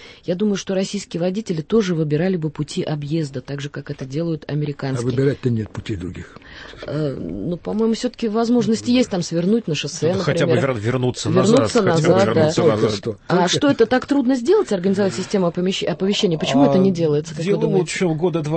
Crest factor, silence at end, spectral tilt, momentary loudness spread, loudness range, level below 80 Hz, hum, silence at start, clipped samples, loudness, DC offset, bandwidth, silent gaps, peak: 16 dB; 0 s; -6 dB/octave; 12 LU; 7 LU; -50 dBFS; none; 0 s; under 0.1%; -19 LUFS; under 0.1%; 8.8 kHz; none; -4 dBFS